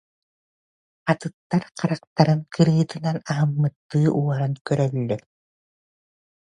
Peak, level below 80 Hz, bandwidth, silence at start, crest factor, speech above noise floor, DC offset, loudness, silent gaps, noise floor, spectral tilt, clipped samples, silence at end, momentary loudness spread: -2 dBFS; -62 dBFS; 10 kHz; 1.05 s; 22 dB; over 68 dB; under 0.1%; -23 LUFS; 1.34-1.50 s, 2.07-2.16 s, 3.76-3.89 s, 4.61-4.65 s; under -90 dBFS; -7.5 dB/octave; under 0.1%; 1.3 s; 7 LU